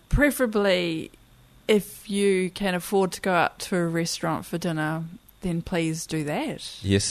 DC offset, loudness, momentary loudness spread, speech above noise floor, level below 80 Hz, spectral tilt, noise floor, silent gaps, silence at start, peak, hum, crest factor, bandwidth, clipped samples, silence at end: under 0.1%; -25 LUFS; 10 LU; 24 dB; -40 dBFS; -5 dB/octave; -49 dBFS; none; 0.1 s; -6 dBFS; none; 18 dB; 13.5 kHz; under 0.1%; 0 s